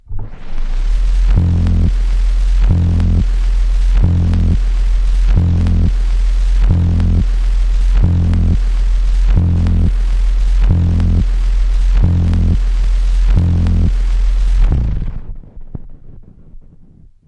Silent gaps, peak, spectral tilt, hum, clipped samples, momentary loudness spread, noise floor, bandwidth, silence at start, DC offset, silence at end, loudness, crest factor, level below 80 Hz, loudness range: none; -2 dBFS; -8 dB/octave; none; under 0.1%; 6 LU; -41 dBFS; 6.6 kHz; 0.1 s; under 0.1%; 0.65 s; -15 LUFS; 10 dB; -12 dBFS; 2 LU